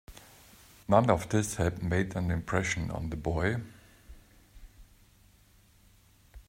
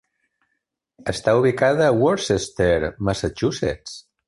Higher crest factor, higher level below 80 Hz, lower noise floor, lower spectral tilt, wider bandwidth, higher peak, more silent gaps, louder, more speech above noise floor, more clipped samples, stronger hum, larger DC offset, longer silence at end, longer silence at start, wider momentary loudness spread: first, 24 dB vs 16 dB; second, -50 dBFS vs -42 dBFS; second, -61 dBFS vs -76 dBFS; about the same, -6 dB/octave vs -5.5 dB/octave; first, 16 kHz vs 11.5 kHz; second, -8 dBFS vs -4 dBFS; neither; second, -30 LUFS vs -20 LUFS; second, 32 dB vs 57 dB; neither; neither; neither; second, 0.1 s vs 0.3 s; second, 0.1 s vs 1.05 s; first, 19 LU vs 11 LU